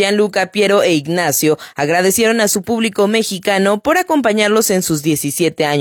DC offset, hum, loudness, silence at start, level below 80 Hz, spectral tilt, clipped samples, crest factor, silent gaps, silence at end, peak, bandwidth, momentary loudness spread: under 0.1%; none; -14 LUFS; 0 s; -54 dBFS; -3.5 dB/octave; under 0.1%; 14 dB; none; 0 s; -2 dBFS; 17 kHz; 4 LU